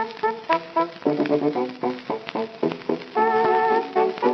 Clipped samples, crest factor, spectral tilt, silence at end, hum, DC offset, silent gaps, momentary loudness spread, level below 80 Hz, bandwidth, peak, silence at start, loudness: under 0.1%; 18 dB; -7 dB/octave; 0 s; none; under 0.1%; none; 9 LU; -76 dBFS; 6.2 kHz; -4 dBFS; 0 s; -23 LUFS